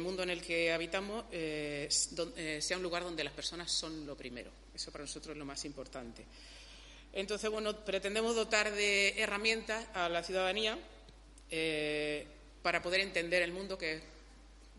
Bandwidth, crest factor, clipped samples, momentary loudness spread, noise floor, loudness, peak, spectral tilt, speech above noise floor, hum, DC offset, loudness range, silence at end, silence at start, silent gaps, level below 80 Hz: 11.5 kHz; 24 dB; under 0.1%; 16 LU; -57 dBFS; -35 LUFS; -14 dBFS; -2 dB/octave; 20 dB; none; under 0.1%; 9 LU; 0 s; 0 s; none; -58 dBFS